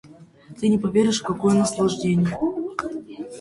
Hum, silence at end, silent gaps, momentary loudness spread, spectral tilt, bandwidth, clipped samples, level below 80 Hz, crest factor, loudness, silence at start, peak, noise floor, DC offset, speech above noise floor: none; 0 s; none; 11 LU; -6 dB/octave; 11.5 kHz; under 0.1%; -54 dBFS; 16 dB; -22 LUFS; 0.05 s; -6 dBFS; -45 dBFS; under 0.1%; 25 dB